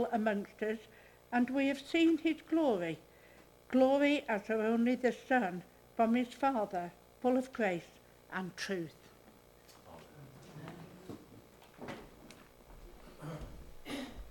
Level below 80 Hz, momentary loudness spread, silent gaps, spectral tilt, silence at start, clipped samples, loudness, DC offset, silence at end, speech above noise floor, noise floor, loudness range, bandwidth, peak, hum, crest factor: -62 dBFS; 22 LU; none; -5.5 dB/octave; 0 s; under 0.1%; -34 LUFS; under 0.1%; 0 s; 28 dB; -61 dBFS; 20 LU; 18 kHz; -16 dBFS; none; 20 dB